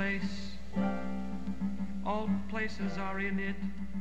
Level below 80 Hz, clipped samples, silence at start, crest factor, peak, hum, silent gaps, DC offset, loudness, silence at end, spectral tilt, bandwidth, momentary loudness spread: -48 dBFS; under 0.1%; 0 s; 16 dB; -18 dBFS; none; none; 2%; -36 LUFS; 0 s; -7 dB/octave; 8.4 kHz; 5 LU